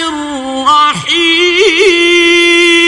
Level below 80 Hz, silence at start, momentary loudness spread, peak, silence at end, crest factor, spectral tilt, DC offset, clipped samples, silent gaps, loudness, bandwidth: -46 dBFS; 0 s; 10 LU; 0 dBFS; 0 s; 8 dB; -2 dB/octave; under 0.1%; 0.3%; none; -7 LUFS; 11.5 kHz